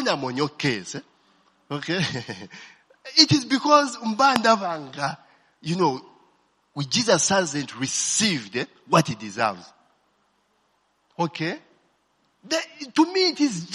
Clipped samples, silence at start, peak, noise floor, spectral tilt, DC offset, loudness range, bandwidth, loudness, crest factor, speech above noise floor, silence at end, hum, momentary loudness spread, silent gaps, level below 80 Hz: under 0.1%; 0 s; 0 dBFS; -68 dBFS; -3.5 dB/octave; under 0.1%; 9 LU; 12.5 kHz; -22 LUFS; 24 dB; 45 dB; 0 s; none; 18 LU; none; -68 dBFS